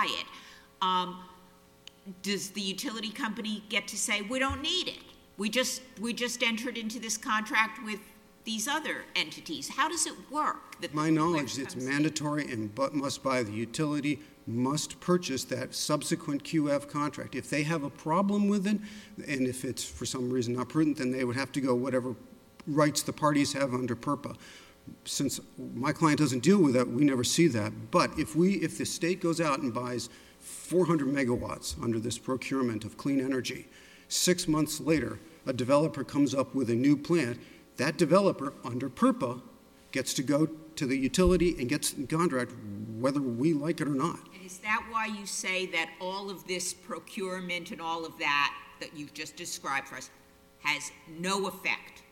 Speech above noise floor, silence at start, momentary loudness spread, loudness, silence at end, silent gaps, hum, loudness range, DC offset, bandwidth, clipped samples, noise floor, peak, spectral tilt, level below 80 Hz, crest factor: 28 dB; 0 s; 12 LU; -30 LUFS; 0.1 s; none; none; 5 LU; under 0.1%; 17.5 kHz; under 0.1%; -58 dBFS; -10 dBFS; -4.5 dB/octave; -54 dBFS; 20 dB